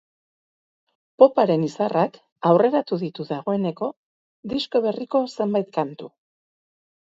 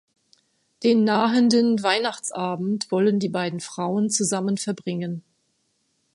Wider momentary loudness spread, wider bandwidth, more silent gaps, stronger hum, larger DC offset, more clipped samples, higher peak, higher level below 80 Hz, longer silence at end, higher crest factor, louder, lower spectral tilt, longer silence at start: first, 13 LU vs 10 LU; second, 7.8 kHz vs 11.5 kHz; first, 2.32-2.36 s, 3.97-4.43 s vs none; neither; neither; neither; first, 0 dBFS vs -4 dBFS; about the same, -66 dBFS vs -70 dBFS; about the same, 1.05 s vs 0.95 s; about the same, 22 dB vs 18 dB; about the same, -22 LUFS vs -22 LUFS; first, -7.5 dB/octave vs -4.5 dB/octave; first, 1.2 s vs 0.8 s